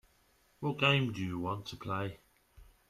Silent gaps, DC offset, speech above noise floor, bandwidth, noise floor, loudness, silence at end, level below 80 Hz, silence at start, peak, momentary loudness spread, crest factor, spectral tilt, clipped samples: none; under 0.1%; 36 dB; 14 kHz; -69 dBFS; -34 LUFS; 0.25 s; -64 dBFS; 0.6 s; -14 dBFS; 12 LU; 22 dB; -6 dB/octave; under 0.1%